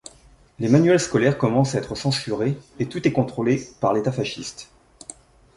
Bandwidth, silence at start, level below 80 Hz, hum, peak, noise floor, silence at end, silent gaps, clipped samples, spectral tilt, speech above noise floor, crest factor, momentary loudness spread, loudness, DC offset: 11.5 kHz; 0.6 s; -54 dBFS; none; -4 dBFS; -52 dBFS; 0.9 s; none; under 0.1%; -6 dB/octave; 31 dB; 20 dB; 19 LU; -22 LUFS; under 0.1%